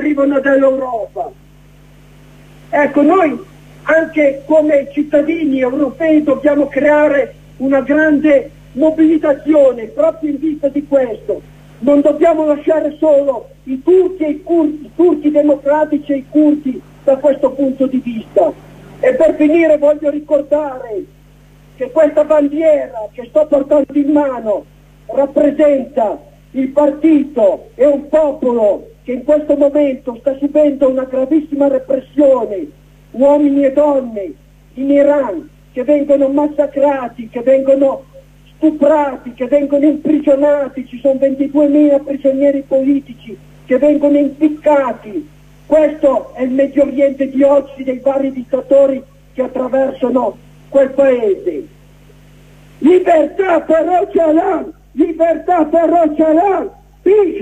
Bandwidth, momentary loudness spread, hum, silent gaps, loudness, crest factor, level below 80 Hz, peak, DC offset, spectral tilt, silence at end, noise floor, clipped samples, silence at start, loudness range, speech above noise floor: 9 kHz; 11 LU; 50 Hz at -45 dBFS; none; -13 LUFS; 12 dB; -46 dBFS; 0 dBFS; under 0.1%; -7 dB/octave; 0 s; -43 dBFS; under 0.1%; 0 s; 2 LU; 30 dB